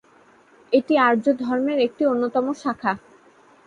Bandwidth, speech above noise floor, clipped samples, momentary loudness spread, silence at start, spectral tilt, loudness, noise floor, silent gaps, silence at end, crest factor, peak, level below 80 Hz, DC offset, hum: 10 kHz; 34 dB; under 0.1%; 8 LU; 0.7 s; -6 dB/octave; -21 LUFS; -54 dBFS; none; 0.7 s; 18 dB; -6 dBFS; -66 dBFS; under 0.1%; none